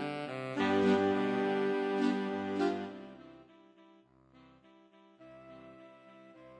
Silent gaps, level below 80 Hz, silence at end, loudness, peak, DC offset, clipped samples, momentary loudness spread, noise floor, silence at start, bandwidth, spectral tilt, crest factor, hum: none; -78 dBFS; 0 s; -32 LUFS; -18 dBFS; under 0.1%; under 0.1%; 25 LU; -63 dBFS; 0 s; 10 kHz; -6.5 dB/octave; 18 dB; none